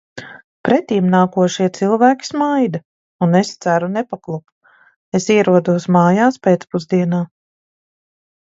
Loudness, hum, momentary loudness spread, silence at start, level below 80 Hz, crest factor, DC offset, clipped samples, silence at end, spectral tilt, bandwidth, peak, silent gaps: -16 LUFS; none; 13 LU; 0.15 s; -62 dBFS; 16 dB; under 0.1%; under 0.1%; 1.2 s; -6.5 dB/octave; 7.8 kHz; 0 dBFS; 0.44-0.64 s, 2.85-3.19 s, 4.52-4.61 s, 4.96-5.12 s